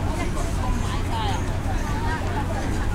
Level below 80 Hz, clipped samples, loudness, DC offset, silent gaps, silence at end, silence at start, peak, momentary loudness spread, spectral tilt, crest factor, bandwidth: -28 dBFS; under 0.1%; -26 LUFS; under 0.1%; none; 0 s; 0 s; -12 dBFS; 1 LU; -5.5 dB/octave; 12 dB; 15.5 kHz